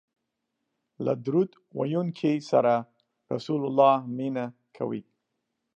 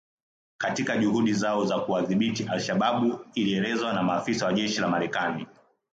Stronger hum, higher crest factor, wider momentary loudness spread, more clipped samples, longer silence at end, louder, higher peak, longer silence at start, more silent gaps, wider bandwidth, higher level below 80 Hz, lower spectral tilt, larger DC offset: neither; first, 20 dB vs 14 dB; first, 13 LU vs 5 LU; neither; first, 0.75 s vs 0.5 s; about the same, -27 LUFS vs -26 LUFS; first, -8 dBFS vs -12 dBFS; first, 1 s vs 0.6 s; neither; about the same, 8.4 kHz vs 9 kHz; second, -80 dBFS vs -66 dBFS; first, -8 dB/octave vs -5 dB/octave; neither